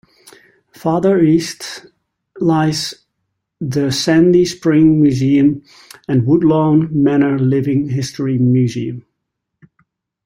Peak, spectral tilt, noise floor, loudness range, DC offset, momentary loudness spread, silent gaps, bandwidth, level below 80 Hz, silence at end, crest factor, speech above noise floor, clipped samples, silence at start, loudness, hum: -2 dBFS; -6.5 dB/octave; -75 dBFS; 5 LU; under 0.1%; 14 LU; none; 16 kHz; -50 dBFS; 1.25 s; 14 dB; 62 dB; under 0.1%; 0.85 s; -14 LUFS; none